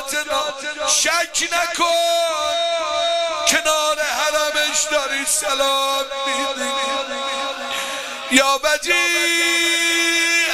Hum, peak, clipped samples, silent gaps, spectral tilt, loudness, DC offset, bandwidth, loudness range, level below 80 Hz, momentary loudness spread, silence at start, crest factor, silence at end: none; 0 dBFS; under 0.1%; none; 1 dB/octave; -18 LUFS; under 0.1%; 15.5 kHz; 3 LU; -54 dBFS; 8 LU; 0 s; 20 dB; 0 s